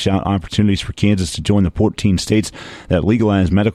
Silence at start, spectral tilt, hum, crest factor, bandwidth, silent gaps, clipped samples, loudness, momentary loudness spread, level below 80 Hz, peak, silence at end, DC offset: 0 s; -6 dB/octave; none; 14 dB; 13 kHz; none; under 0.1%; -17 LUFS; 4 LU; -34 dBFS; -2 dBFS; 0 s; under 0.1%